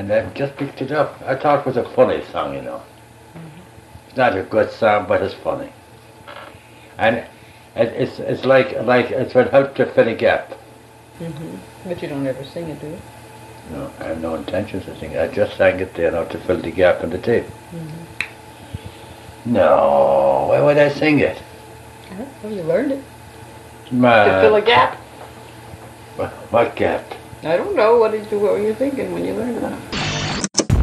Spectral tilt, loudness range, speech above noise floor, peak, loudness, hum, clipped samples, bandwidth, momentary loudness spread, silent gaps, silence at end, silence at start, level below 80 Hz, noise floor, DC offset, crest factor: -5 dB/octave; 8 LU; 26 dB; 0 dBFS; -18 LUFS; none; under 0.1%; 13 kHz; 24 LU; none; 0 s; 0 s; -44 dBFS; -43 dBFS; under 0.1%; 20 dB